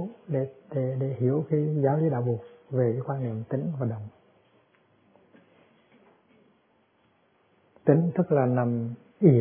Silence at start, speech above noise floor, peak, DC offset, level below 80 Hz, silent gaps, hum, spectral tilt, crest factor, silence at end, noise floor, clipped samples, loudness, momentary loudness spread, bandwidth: 0 s; 40 dB; -6 dBFS; under 0.1%; -70 dBFS; none; none; -13.5 dB/octave; 22 dB; 0 s; -66 dBFS; under 0.1%; -27 LUFS; 10 LU; 3.5 kHz